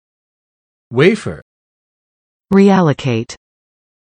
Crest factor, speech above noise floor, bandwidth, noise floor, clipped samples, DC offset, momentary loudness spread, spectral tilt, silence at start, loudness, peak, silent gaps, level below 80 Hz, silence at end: 16 dB; over 78 dB; 10 kHz; under -90 dBFS; under 0.1%; under 0.1%; 18 LU; -7 dB/octave; 0.9 s; -14 LUFS; 0 dBFS; 1.42-2.40 s; -52 dBFS; 0.7 s